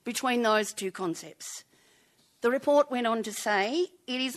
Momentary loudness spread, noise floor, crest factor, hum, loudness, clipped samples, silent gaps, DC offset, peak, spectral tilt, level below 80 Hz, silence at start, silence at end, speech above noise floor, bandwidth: 15 LU; -65 dBFS; 18 dB; none; -28 LUFS; under 0.1%; none; under 0.1%; -12 dBFS; -3 dB/octave; -80 dBFS; 0.05 s; 0 s; 37 dB; 13 kHz